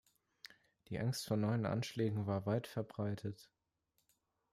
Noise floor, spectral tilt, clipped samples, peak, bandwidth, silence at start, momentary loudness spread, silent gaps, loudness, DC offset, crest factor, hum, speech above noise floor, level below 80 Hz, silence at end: -83 dBFS; -6.5 dB/octave; under 0.1%; -24 dBFS; 15 kHz; 0.9 s; 21 LU; none; -39 LUFS; under 0.1%; 16 dB; none; 45 dB; -74 dBFS; 1.1 s